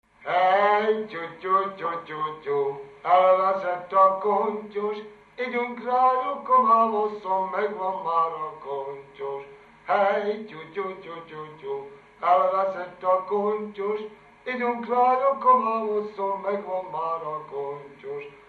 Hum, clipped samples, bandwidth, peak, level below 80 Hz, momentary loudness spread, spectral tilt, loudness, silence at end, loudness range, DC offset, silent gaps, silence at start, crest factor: 50 Hz at -70 dBFS; under 0.1%; 6.6 kHz; -8 dBFS; -72 dBFS; 16 LU; -6.5 dB/octave; -24 LUFS; 0.15 s; 5 LU; under 0.1%; none; 0.2 s; 18 dB